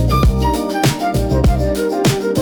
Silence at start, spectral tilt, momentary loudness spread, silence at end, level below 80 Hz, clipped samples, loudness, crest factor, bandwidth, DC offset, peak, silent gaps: 0 s; -6 dB/octave; 3 LU; 0 s; -20 dBFS; under 0.1%; -16 LUFS; 10 dB; over 20 kHz; under 0.1%; -4 dBFS; none